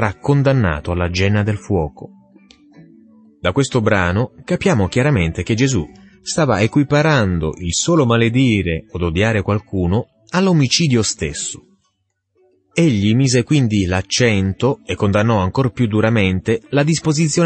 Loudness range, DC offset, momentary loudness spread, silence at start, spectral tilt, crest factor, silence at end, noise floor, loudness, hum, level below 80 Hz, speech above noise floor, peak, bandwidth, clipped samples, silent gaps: 4 LU; under 0.1%; 8 LU; 0 s; -5.5 dB/octave; 14 dB; 0 s; -69 dBFS; -17 LUFS; none; -38 dBFS; 53 dB; -2 dBFS; 8.8 kHz; under 0.1%; none